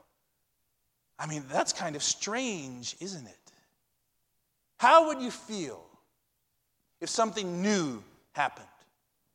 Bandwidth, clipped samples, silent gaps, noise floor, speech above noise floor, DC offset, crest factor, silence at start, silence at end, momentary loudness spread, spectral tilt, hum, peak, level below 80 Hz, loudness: 15 kHz; under 0.1%; none; -78 dBFS; 49 dB; under 0.1%; 24 dB; 1.2 s; 0.7 s; 20 LU; -3 dB/octave; none; -8 dBFS; -76 dBFS; -29 LUFS